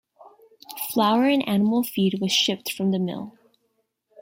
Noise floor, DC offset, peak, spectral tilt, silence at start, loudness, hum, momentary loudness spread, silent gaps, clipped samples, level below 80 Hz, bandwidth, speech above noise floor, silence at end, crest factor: -73 dBFS; under 0.1%; -8 dBFS; -4.5 dB/octave; 0.2 s; -22 LUFS; none; 13 LU; none; under 0.1%; -68 dBFS; 16.5 kHz; 51 dB; 0.9 s; 18 dB